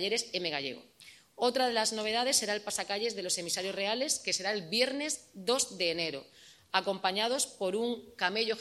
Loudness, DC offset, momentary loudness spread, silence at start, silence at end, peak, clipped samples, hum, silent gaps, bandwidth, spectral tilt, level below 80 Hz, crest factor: -31 LUFS; under 0.1%; 6 LU; 0 s; 0 s; -10 dBFS; under 0.1%; none; none; 14 kHz; -1.5 dB/octave; -76 dBFS; 22 dB